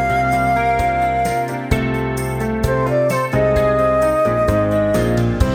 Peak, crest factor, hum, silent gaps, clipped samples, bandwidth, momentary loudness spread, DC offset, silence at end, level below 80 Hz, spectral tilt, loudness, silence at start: 0 dBFS; 16 dB; none; none; under 0.1%; 19.5 kHz; 5 LU; under 0.1%; 0 s; -28 dBFS; -7 dB/octave; -17 LUFS; 0 s